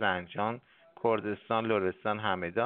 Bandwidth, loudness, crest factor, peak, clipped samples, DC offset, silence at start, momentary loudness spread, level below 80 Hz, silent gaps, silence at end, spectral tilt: 4.4 kHz; -32 LUFS; 20 dB; -12 dBFS; under 0.1%; under 0.1%; 0 s; 5 LU; -70 dBFS; none; 0 s; -3.5 dB/octave